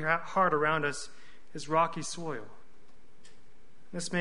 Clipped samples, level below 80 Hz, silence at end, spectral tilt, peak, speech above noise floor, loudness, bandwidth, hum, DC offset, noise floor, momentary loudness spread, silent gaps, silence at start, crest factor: under 0.1%; -66 dBFS; 0 s; -4 dB/octave; -12 dBFS; 32 dB; -30 LUFS; 10.5 kHz; none; 1%; -63 dBFS; 17 LU; none; 0 s; 22 dB